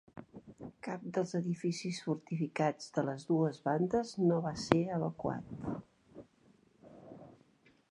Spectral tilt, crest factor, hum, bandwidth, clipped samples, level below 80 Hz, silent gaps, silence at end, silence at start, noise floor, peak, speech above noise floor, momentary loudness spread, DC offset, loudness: -6.5 dB/octave; 30 dB; none; 11 kHz; under 0.1%; -66 dBFS; none; 0.6 s; 0.15 s; -67 dBFS; -6 dBFS; 33 dB; 21 LU; under 0.1%; -35 LUFS